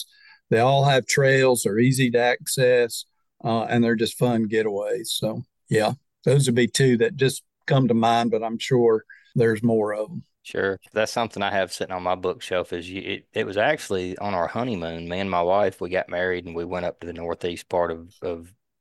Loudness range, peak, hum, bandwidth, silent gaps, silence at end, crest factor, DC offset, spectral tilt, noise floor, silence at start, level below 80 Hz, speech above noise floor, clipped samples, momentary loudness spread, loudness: 6 LU; -6 dBFS; none; 12.5 kHz; none; 0.35 s; 16 dB; under 0.1%; -5 dB/octave; -47 dBFS; 0 s; -60 dBFS; 24 dB; under 0.1%; 12 LU; -23 LUFS